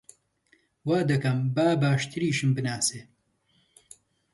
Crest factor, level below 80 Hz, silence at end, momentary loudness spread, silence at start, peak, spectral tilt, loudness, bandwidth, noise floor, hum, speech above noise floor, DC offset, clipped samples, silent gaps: 16 dB; -64 dBFS; 1.3 s; 5 LU; 0.85 s; -12 dBFS; -5.5 dB/octave; -26 LUFS; 12 kHz; -69 dBFS; none; 44 dB; under 0.1%; under 0.1%; none